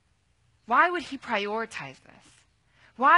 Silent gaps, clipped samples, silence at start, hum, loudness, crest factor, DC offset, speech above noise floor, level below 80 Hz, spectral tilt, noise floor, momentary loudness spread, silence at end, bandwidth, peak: none; under 0.1%; 0.7 s; none; -27 LUFS; 22 dB; under 0.1%; 39 dB; -70 dBFS; -3.5 dB/octave; -68 dBFS; 15 LU; 0 s; 11 kHz; -6 dBFS